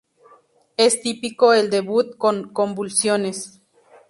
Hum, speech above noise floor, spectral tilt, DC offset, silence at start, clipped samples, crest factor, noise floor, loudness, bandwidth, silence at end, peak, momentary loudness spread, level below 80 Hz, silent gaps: none; 35 dB; -3 dB/octave; under 0.1%; 0.8 s; under 0.1%; 18 dB; -55 dBFS; -19 LUFS; 11.5 kHz; 0.6 s; -2 dBFS; 12 LU; -68 dBFS; none